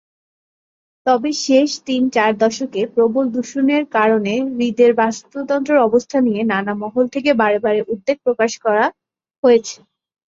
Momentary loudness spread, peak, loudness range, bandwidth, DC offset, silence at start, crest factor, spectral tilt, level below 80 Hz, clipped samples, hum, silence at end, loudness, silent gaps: 6 LU; -2 dBFS; 1 LU; 7.8 kHz; under 0.1%; 1.05 s; 16 dB; -4.5 dB/octave; -62 dBFS; under 0.1%; none; 0.5 s; -17 LUFS; 9.38-9.43 s